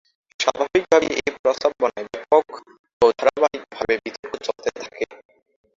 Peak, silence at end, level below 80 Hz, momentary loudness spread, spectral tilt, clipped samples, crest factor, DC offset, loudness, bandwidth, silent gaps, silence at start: -2 dBFS; 0.65 s; -58 dBFS; 13 LU; -3 dB/octave; under 0.1%; 20 dB; under 0.1%; -21 LUFS; 7.6 kHz; 1.39-1.44 s, 2.79-2.84 s, 2.93-3.00 s, 4.19-4.23 s; 0.4 s